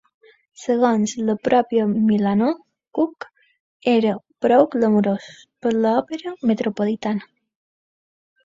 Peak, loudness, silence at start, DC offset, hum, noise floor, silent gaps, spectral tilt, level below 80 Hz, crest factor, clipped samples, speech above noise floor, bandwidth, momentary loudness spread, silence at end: -2 dBFS; -20 LUFS; 0.6 s; under 0.1%; none; under -90 dBFS; 3.60-3.80 s; -6.5 dB/octave; -64 dBFS; 18 dB; under 0.1%; over 71 dB; 7.8 kHz; 11 LU; 1.2 s